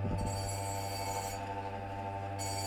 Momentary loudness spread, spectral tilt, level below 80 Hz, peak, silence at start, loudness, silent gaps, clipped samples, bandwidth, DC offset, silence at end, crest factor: 4 LU; -4.5 dB/octave; -50 dBFS; -24 dBFS; 0 s; -38 LUFS; none; under 0.1%; 17 kHz; under 0.1%; 0 s; 14 dB